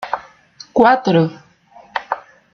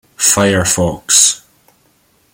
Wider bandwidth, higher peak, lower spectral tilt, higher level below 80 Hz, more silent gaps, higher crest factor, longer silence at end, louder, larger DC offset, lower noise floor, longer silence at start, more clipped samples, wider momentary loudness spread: second, 6.6 kHz vs over 20 kHz; about the same, -2 dBFS vs 0 dBFS; first, -7 dB/octave vs -2 dB/octave; second, -56 dBFS vs -44 dBFS; neither; about the same, 16 dB vs 16 dB; second, 0.35 s vs 0.95 s; second, -17 LUFS vs -11 LUFS; neither; second, -46 dBFS vs -55 dBFS; second, 0 s vs 0.2 s; neither; first, 15 LU vs 7 LU